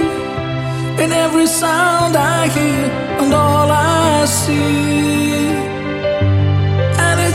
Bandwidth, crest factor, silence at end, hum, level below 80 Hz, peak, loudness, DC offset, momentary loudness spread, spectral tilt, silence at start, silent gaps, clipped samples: 16 kHz; 12 dB; 0 s; none; -40 dBFS; -2 dBFS; -14 LUFS; under 0.1%; 7 LU; -5 dB/octave; 0 s; none; under 0.1%